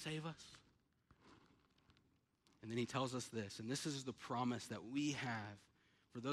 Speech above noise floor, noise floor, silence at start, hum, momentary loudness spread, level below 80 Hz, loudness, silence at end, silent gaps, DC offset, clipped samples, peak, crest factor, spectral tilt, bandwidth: 33 dB; -78 dBFS; 0 s; none; 16 LU; -80 dBFS; -45 LUFS; 0 s; none; under 0.1%; under 0.1%; -28 dBFS; 20 dB; -4.5 dB/octave; 14.5 kHz